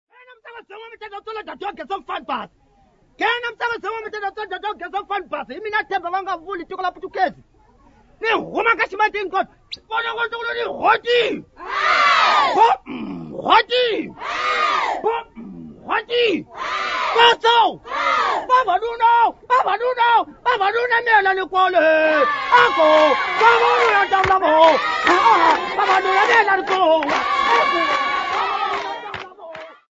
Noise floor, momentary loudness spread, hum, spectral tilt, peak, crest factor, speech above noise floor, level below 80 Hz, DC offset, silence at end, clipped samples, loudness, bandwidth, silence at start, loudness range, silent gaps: -56 dBFS; 16 LU; none; -3 dB/octave; 0 dBFS; 18 dB; 38 dB; -54 dBFS; under 0.1%; 0.2 s; under 0.1%; -17 LUFS; 7.8 kHz; 0.3 s; 11 LU; none